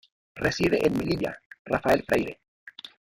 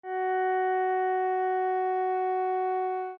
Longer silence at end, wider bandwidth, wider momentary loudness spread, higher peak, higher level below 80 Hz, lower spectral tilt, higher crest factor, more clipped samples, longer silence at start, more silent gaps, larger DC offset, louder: first, 0.25 s vs 0 s; first, 17 kHz vs 3.9 kHz; first, 21 LU vs 2 LU; first, -8 dBFS vs -20 dBFS; first, -52 dBFS vs -80 dBFS; about the same, -5.5 dB/octave vs -5.5 dB/octave; first, 18 dB vs 8 dB; neither; first, 0.35 s vs 0.05 s; first, 1.46-1.50 s, 1.59-1.65 s, 2.48-2.67 s vs none; neither; about the same, -26 LUFS vs -28 LUFS